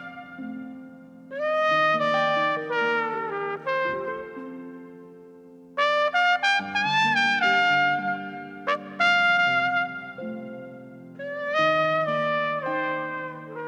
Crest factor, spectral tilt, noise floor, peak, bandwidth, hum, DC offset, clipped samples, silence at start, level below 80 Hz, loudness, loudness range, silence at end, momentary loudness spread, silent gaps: 18 dB; -4 dB/octave; -47 dBFS; -8 dBFS; 10.5 kHz; none; under 0.1%; under 0.1%; 0 s; -70 dBFS; -23 LUFS; 5 LU; 0 s; 18 LU; none